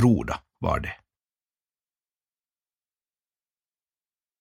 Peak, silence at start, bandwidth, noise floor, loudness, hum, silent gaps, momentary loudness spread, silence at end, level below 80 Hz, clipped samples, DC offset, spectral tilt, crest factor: -8 dBFS; 0 s; 12.5 kHz; under -90 dBFS; -27 LUFS; none; none; 14 LU; 3.45 s; -46 dBFS; under 0.1%; under 0.1%; -7.5 dB/octave; 24 dB